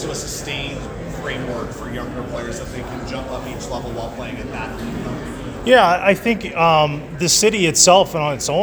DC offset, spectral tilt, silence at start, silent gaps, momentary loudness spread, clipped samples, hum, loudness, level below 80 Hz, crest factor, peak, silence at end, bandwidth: under 0.1%; -3 dB/octave; 0 s; none; 16 LU; under 0.1%; none; -18 LUFS; -38 dBFS; 20 dB; 0 dBFS; 0 s; over 20 kHz